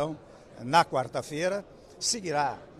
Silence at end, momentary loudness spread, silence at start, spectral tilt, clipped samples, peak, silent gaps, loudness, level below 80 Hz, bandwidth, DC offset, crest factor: 0 s; 12 LU; 0 s; -3 dB/octave; under 0.1%; -10 dBFS; none; -28 LUFS; -62 dBFS; 14.5 kHz; under 0.1%; 20 dB